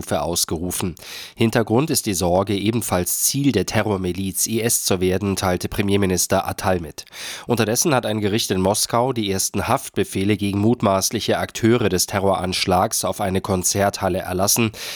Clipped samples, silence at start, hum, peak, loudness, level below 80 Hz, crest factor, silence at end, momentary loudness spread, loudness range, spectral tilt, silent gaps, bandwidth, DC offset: under 0.1%; 0 s; none; -4 dBFS; -20 LUFS; -46 dBFS; 16 dB; 0 s; 5 LU; 1 LU; -4 dB/octave; none; over 20 kHz; under 0.1%